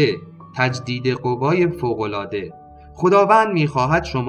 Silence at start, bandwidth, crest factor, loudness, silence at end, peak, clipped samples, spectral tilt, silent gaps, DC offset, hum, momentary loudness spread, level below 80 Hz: 0 s; 10 kHz; 18 dB; -19 LUFS; 0 s; -2 dBFS; under 0.1%; -6.5 dB/octave; none; under 0.1%; none; 14 LU; -46 dBFS